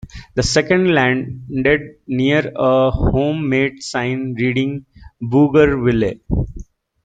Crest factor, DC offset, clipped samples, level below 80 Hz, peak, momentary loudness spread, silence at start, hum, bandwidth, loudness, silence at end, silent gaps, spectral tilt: 16 dB; under 0.1%; under 0.1%; -32 dBFS; -2 dBFS; 10 LU; 0.05 s; none; 9.4 kHz; -17 LUFS; 0.45 s; none; -6 dB/octave